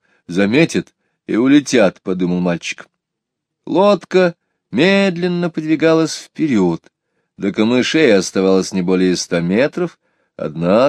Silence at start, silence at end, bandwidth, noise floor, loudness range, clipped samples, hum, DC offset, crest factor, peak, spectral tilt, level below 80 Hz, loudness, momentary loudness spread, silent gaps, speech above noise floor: 0.3 s; 0 s; 11 kHz; -79 dBFS; 1 LU; under 0.1%; none; under 0.1%; 16 dB; 0 dBFS; -5.5 dB/octave; -58 dBFS; -16 LUFS; 11 LU; none; 64 dB